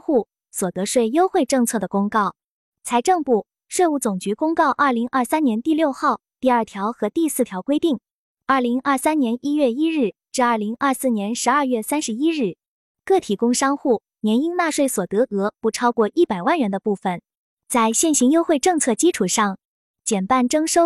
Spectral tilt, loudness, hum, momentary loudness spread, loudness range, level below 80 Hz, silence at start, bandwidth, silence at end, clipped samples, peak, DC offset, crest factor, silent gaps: -4 dB/octave; -20 LUFS; none; 6 LU; 2 LU; -64 dBFS; 0.1 s; 14 kHz; 0 s; under 0.1%; -6 dBFS; under 0.1%; 14 dB; 2.44-2.72 s, 8.11-8.35 s, 12.68-12.95 s, 17.37-17.57 s, 19.65-19.94 s